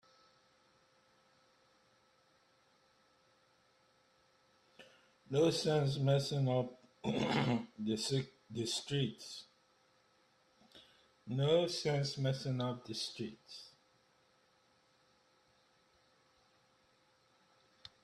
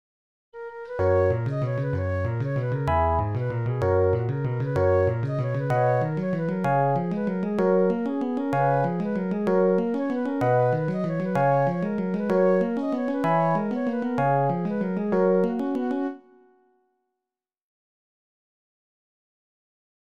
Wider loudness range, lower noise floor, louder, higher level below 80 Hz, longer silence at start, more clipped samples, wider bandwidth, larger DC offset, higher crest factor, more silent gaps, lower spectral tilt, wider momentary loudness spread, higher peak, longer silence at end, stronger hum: first, 9 LU vs 3 LU; second, -72 dBFS vs -88 dBFS; second, -36 LUFS vs -24 LUFS; second, -74 dBFS vs -48 dBFS; first, 4.8 s vs 0.55 s; neither; first, 13 kHz vs 8.6 kHz; second, under 0.1% vs 0.3%; first, 20 dB vs 14 dB; neither; second, -5.5 dB/octave vs -9.5 dB/octave; first, 17 LU vs 6 LU; second, -20 dBFS vs -10 dBFS; first, 4.35 s vs 3.8 s; neither